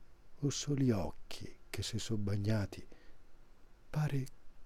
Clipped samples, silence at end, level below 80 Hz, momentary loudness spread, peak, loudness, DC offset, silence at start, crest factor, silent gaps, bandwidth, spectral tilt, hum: under 0.1%; 0 s; -54 dBFS; 15 LU; -20 dBFS; -38 LUFS; under 0.1%; 0 s; 18 dB; none; 15 kHz; -5.5 dB/octave; none